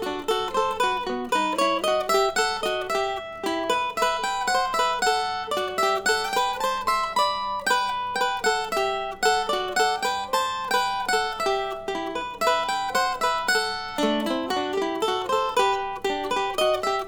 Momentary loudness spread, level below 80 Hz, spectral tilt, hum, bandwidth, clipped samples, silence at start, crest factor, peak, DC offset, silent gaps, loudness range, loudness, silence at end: 5 LU; -52 dBFS; -2 dB/octave; none; over 20 kHz; under 0.1%; 0 s; 18 dB; -8 dBFS; under 0.1%; none; 1 LU; -24 LUFS; 0 s